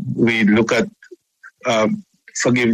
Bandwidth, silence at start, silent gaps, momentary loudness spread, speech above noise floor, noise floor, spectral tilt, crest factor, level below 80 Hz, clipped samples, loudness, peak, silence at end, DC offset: 10.5 kHz; 0 s; none; 13 LU; 31 dB; -47 dBFS; -5 dB/octave; 14 dB; -56 dBFS; under 0.1%; -18 LUFS; -4 dBFS; 0 s; under 0.1%